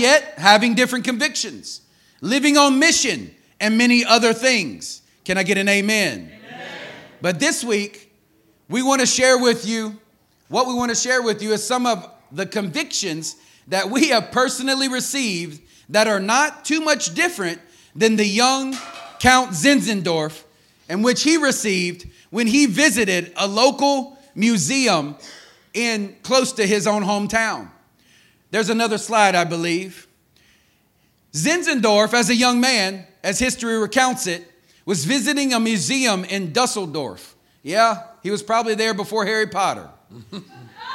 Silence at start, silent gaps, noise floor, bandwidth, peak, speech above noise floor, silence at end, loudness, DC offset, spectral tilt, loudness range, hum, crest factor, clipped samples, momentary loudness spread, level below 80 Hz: 0 s; none; -61 dBFS; 16.5 kHz; 0 dBFS; 42 dB; 0 s; -18 LUFS; under 0.1%; -3 dB/octave; 5 LU; none; 20 dB; under 0.1%; 16 LU; -54 dBFS